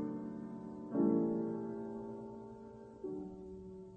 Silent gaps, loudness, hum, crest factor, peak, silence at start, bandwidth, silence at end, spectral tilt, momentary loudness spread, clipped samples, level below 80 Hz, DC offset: none; -40 LUFS; none; 18 dB; -22 dBFS; 0 s; 3.4 kHz; 0 s; -10.5 dB/octave; 17 LU; under 0.1%; -68 dBFS; under 0.1%